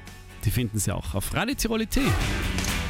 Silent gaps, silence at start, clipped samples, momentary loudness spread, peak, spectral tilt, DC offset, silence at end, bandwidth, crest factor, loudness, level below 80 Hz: none; 0 s; under 0.1%; 5 LU; -12 dBFS; -4.5 dB/octave; under 0.1%; 0 s; 16.5 kHz; 14 dB; -26 LUFS; -34 dBFS